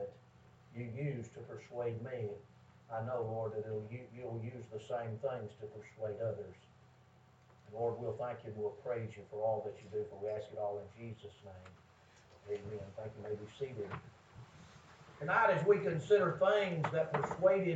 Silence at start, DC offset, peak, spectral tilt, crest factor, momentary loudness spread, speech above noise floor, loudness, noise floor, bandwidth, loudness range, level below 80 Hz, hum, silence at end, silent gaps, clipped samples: 0 s; under 0.1%; -16 dBFS; -7 dB/octave; 22 dB; 21 LU; 27 dB; -38 LUFS; -64 dBFS; 8 kHz; 13 LU; -74 dBFS; none; 0 s; none; under 0.1%